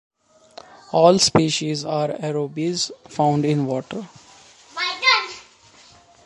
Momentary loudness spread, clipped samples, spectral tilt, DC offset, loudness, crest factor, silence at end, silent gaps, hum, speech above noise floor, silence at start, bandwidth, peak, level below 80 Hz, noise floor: 18 LU; under 0.1%; -4 dB/octave; under 0.1%; -20 LUFS; 22 dB; 0.85 s; none; none; 30 dB; 0.9 s; 11.5 kHz; 0 dBFS; -58 dBFS; -50 dBFS